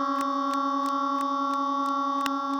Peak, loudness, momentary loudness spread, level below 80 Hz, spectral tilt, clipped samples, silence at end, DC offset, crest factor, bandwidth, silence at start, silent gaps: -10 dBFS; -27 LUFS; 0 LU; -80 dBFS; -2.5 dB/octave; under 0.1%; 0 s; under 0.1%; 18 dB; 19.5 kHz; 0 s; none